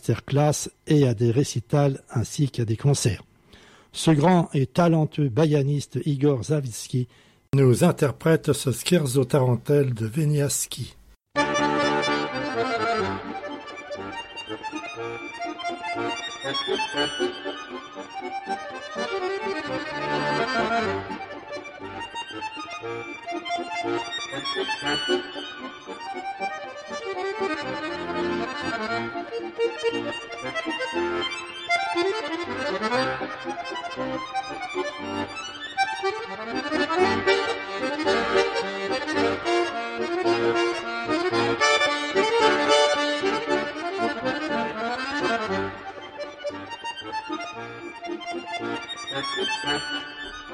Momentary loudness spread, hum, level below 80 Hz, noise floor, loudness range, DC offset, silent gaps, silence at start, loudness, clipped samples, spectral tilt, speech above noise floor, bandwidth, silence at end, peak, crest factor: 13 LU; none; -58 dBFS; -52 dBFS; 8 LU; under 0.1%; none; 0.05 s; -25 LUFS; under 0.1%; -5 dB/octave; 27 dB; 15 kHz; 0 s; -6 dBFS; 20 dB